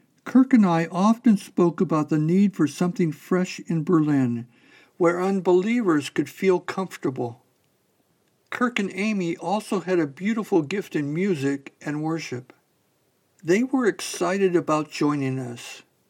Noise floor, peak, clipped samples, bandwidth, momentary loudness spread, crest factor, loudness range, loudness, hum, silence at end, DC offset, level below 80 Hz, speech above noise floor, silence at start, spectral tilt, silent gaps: -67 dBFS; -6 dBFS; under 0.1%; 16.5 kHz; 10 LU; 18 dB; 5 LU; -23 LUFS; none; 0.3 s; under 0.1%; -84 dBFS; 45 dB; 0.25 s; -6.5 dB/octave; none